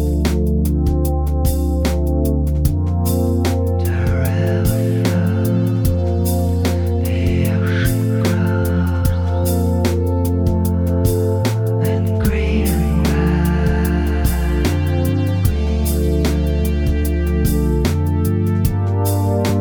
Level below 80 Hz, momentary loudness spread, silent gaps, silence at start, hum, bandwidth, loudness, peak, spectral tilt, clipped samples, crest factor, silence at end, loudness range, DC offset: -22 dBFS; 1 LU; none; 0 s; none; over 20 kHz; -17 LUFS; -2 dBFS; -7 dB/octave; under 0.1%; 14 dB; 0 s; 1 LU; under 0.1%